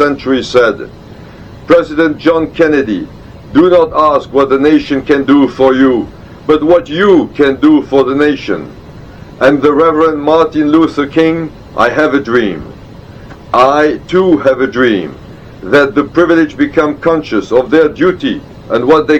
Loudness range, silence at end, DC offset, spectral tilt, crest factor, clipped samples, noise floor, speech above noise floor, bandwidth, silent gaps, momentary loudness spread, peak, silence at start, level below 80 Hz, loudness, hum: 3 LU; 0 s; under 0.1%; -6.5 dB/octave; 10 dB; 0.6%; -31 dBFS; 22 dB; 8.4 kHz; none; 10 LU; 0 dBFS; 0 s; -38 dBFS; -10 LUFS; none